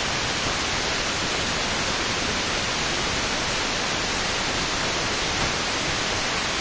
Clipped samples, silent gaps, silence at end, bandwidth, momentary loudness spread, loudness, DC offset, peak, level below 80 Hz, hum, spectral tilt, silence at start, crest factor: under 0.1%; none; 0 s; 8 kHz; 0 LU; -23 LUFS; under 0.1%; -12 dBFS; -40 dBFS; none; -2 dB/octave; 0 s; 14 dB